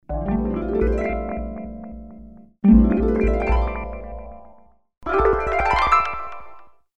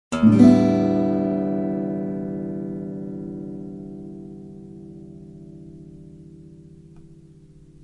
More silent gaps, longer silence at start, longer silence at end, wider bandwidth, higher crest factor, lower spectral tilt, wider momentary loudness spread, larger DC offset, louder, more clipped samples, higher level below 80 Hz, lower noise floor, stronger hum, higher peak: neither; about the same, 0 s vs 0.1 s; second, 0 s vs 0.8 s; second, 7.4 kHz vs 10.5 kHz; about the same, 18 dB vs 22 dB; about the same, -8 dB/octave vs -8.5 dB/octave; second, 22 LU vs 28 LU; neither; about the same, -20 LUFS vs -20 LUFS; neither; first, -28 dBFS vs -54 dBFS; first, -52 dBFS vs -48 dBFS; neither; about the same, -4 dBFS vs -2 dBFS